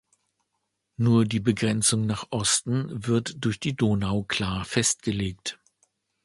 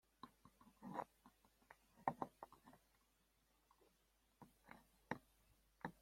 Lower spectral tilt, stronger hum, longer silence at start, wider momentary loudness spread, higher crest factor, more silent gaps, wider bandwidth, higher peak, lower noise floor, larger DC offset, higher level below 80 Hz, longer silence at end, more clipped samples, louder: second, -4 dB/octave vs -6 dB/octave; neither; first, 1 s vs 0.25 s; second, 7 LU vs 21 LU; second, 18 dB vs 34 dB; neither; second, 11.5 kHz vs 16.5 kHz; first, -8 dBFS vs -24 dBFS; about the same, -79 dBFS vs -81 dBFS; neither; first, -50 dBFS vs -82 dBFS; first, 0.7 s vs 0.1 s; neither; first, -25 LUFS vs -53 LUFS